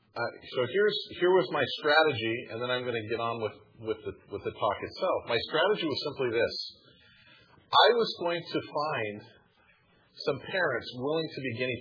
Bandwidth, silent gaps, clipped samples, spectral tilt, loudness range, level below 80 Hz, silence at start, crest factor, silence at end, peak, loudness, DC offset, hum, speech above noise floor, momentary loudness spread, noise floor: 5.4 kHz; none; under 0.1%; -6 dB/octave; 5 LU; -68 dBFS; 0.15 s; 22 dB; 0 s; -8 dBFS; -29 LUFS; under 0.1%; none; 35 dB; 13 LU; -64 dBFS